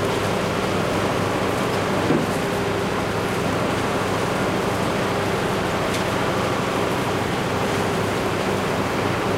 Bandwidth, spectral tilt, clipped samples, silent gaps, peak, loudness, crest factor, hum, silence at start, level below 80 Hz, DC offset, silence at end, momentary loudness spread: 16 kHz; -5 dB/octave; under 0.1%; none; -8 dBFS; -22 LUFS; 14 dB; none; 0 s; -42 dBFS; under 0.1%; 0 s; 1 LU